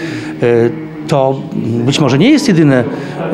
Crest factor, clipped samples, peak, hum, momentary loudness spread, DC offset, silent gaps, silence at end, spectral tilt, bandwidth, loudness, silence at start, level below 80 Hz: 12 dB; under 0.1%; 0 dBFS; none; 11 LU; under 0.1%; none; 0 s; -6.5 dB/octave; 13 kHz; -12 LUFS; 0 s; -50 dBFS